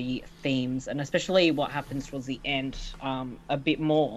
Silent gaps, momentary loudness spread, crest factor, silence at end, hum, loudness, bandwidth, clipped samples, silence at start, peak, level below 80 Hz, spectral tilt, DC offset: none; 12 LU; 18 dB; 0 s; none; -29 LUFS; 13 kHz; under 0.1%; 0 s; -10 dBFS; -48 dBFS; -5.5 dB/octave; under 0.1%